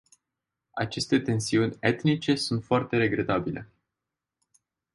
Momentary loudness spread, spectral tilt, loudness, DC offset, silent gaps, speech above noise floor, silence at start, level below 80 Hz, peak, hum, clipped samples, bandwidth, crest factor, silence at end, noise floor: 9 LU; -5.5 dB/octave; -26 LUFS; under 0.1%; none; 61 dB; 0.75 s; -58 dBFS; -8 dBFS; none; under 0.1%; 11.5 kHz; 20 dB; 1.3 s; -87 dBFS